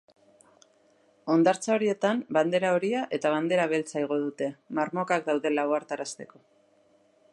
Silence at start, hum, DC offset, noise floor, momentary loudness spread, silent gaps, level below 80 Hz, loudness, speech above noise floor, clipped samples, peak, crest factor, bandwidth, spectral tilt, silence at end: 1.25 s; none; under 0.1%; -64 dBFS; 11 LU; none; -80 dBFS; -27 LUFS; 37 dB; under 0.1%; -10 dBFS; 18 dB; 11.5 kHz; -5 dB/octave; 1.1 s